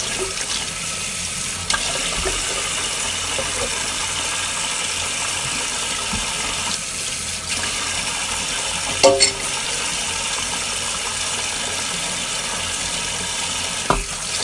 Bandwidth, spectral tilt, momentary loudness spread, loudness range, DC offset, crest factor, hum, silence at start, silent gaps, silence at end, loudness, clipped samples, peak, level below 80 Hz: 12 kHz; -0.5 dB/octave; 3 LU; 3 LU; under 0.1%; 22 dB; none; 0 s; none; 0 s; -20 LUFS; under 0.1%; 0 dBFS; -40 dBFS